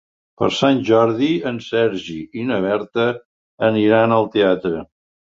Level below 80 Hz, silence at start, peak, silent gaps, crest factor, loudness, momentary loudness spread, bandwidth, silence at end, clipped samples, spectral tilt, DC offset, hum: -56 dBFS; 0.4 s; -2 dBFS; 3.25-3.58 s; 16 dB; -18 LUFS; 11 LU; 7.8 kHz; 0.5 s; under 0.1%; -6.5 dB/octave; under 0.1%; none